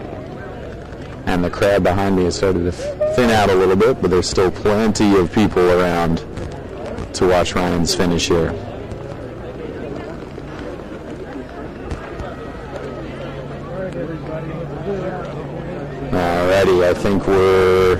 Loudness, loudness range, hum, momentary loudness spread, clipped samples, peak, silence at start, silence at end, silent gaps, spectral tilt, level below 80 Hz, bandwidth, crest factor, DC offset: -17 LUFS; 14 LU; none; 16 LU; under 0.1%; -8 dBFS; 0 s; 0 s; none; -5.5 dB/octave; -36 dBFS; 15.5 kHz; 10 dB; under 0.1%